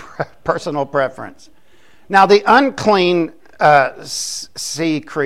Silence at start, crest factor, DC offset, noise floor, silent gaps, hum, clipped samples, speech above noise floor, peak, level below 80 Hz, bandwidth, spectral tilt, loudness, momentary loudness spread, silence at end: 0 s; 16 dB; 0.7%; -53 dBFS; none; none; under 0.1%; 37 dB; 0 dBFS; -54 dBFS; 15.5 kHz; -4 dB/octave; -15 LUFS; 14 LU; 0 s